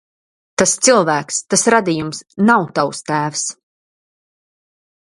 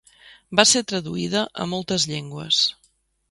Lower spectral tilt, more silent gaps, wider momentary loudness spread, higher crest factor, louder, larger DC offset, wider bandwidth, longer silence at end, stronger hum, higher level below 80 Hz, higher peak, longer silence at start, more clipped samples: about the same, -3 dB/octave vs -2.5 dB/octave; neither; about the same, 10 LU vs 11 LU; second, 18 dB vs 24 dB; first, -16 LUFS vs -21 LUFS; neither; about the same, 11.5 kHz vs 11.5 kHz; first, 1.6 s vs 0.6 s; neither; about the same, -58 dBFS vs -58 dBFS; about the same, 0 dBFS vs 0 dBFS; first, 0.6 s vs 0.25 s; neither